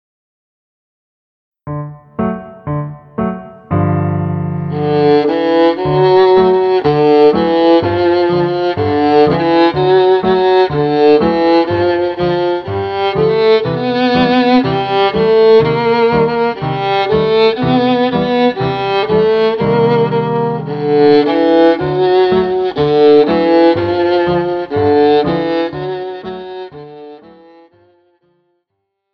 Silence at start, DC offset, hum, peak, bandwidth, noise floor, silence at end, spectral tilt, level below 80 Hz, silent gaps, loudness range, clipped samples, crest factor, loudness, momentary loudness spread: 1.65 s; under 0.1%; none; 0 dBFS; 6 kHz; -72 dBFS; 1.95 s; -8.5 dB/octave; -44 dBFS; none; 8 LU; under 0.1%; 12 dB; -12 LUFS; 11 LU